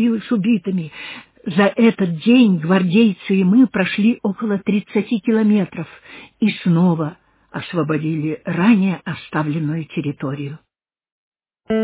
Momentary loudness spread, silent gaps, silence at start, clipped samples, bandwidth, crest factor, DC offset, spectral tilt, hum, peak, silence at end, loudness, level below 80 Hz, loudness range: 14 LU; 11.12-11.32 s; 0 s; under 0.1%; 4 kHz; 16 dB; under 0.1%; -11.5 dB/octave; none; -2 dBFS; 0 s; -18 LUFS; -60 dBFS; 5 LU